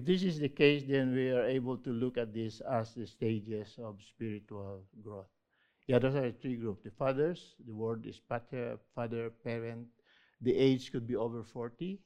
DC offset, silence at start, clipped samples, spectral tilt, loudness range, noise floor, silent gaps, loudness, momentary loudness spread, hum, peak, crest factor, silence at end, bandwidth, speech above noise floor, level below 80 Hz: under 0.1%; 0 s; under 0.1%; -7.5 dB/octave; 7 LU; -75 dBFS; none; -35 LUFS; 18 LU; none; -12 dBFS; 24 dB; 0.1 s; 9.4 kHz; 41 dB; -66 dBFS